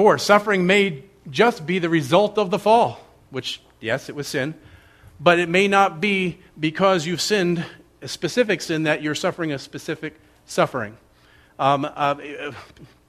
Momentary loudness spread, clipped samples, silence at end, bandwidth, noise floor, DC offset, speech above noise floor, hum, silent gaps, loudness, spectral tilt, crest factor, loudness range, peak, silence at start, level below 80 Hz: 14 LU; under 0.1%; 0.25 s; 14 kHz; -54 dBFS; under 0.1%; 33 dB; none; none; -21 LUFS; -4.5 dB/octave; 22 dB; 5 LU; 0 dBFS; 0 s; -58 dBFS